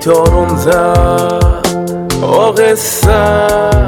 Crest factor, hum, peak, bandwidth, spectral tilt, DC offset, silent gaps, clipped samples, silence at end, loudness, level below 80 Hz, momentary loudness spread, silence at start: 10 dB; none; 0 dBFS; 19 kHz; -5.5 dB/octave; under 0.1%; none; 1%; 0 s; -10 LUFS; -18 dBFS; 6 LU; 0 s